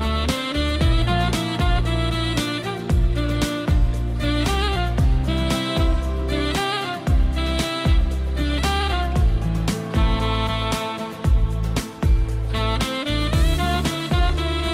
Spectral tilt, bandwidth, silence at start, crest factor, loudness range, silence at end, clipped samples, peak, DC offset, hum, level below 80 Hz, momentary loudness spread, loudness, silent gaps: -5.5 dB/octave; 15.5 kHz; 0 s; 12 dB; 1 LU; 0 s; under 0.1%; -8 dBFS; under 0.1%; none; -22 dBFS; 4 LU; -22 LUFS; none